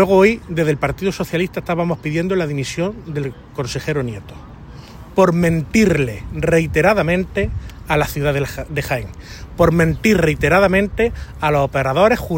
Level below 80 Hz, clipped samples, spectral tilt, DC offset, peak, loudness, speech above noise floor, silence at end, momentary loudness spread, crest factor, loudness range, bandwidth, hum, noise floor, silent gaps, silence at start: -34 dBFS; under 0.1%; -6.5 dB/octave; under 0.1%; 0 dBFS; -18 LUFS; 19 dB; 0 s; 13 LU; 16 dB; 5 LU; 16.5 kHz; none; -36 dBFS; none; 0 s